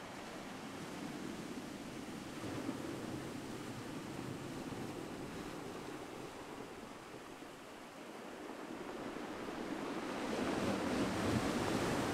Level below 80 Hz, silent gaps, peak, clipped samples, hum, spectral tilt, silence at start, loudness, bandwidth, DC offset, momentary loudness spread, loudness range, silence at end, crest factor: -64 dBFS; none; -24 dBFS; under 0.1%; none; -5 dB/octave; 0 s; -43 LUFS; 16 kHz; under 0.1%; 13 LU; 9 LU; 0 s; 18 dB